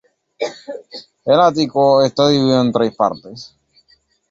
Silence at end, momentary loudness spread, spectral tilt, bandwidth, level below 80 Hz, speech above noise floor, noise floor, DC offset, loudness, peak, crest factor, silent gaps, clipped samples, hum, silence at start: 0.85 s; 19 LU; -6 dB/octave; 7.8 kHz; -58 dBFS; 42 dB; -57 dBFS; under 0.1%; -15 LUFS; -2 dBFS; 16 dB; none; under 0.1%; none; 0.4 s